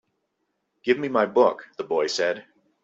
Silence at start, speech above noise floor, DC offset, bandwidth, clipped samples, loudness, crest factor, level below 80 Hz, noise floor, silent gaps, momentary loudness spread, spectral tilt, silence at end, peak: 0.85 s; 53 dB; under 0.1%; 8 kHz; under 0.1%; -23 LUFS; 20 dB; -70 dBFS; -76 dBFS; none; 13 LU; -4 dB/octave; 0.45 s; -4 dBFS